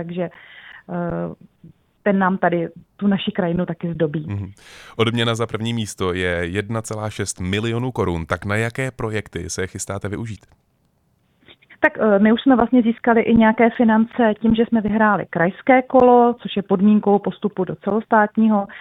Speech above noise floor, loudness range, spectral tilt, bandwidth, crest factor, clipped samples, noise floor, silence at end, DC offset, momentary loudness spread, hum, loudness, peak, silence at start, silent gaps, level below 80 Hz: 45 dB; 8 LU; -6 dB/octave; 12.5 kHz; 18 dB; under 0.1%; -63 dBFS; 0 s; under 0.1%; 12 LU; none; -19 LUFS; 0 dBFS; 0 s; none; -48 dBFS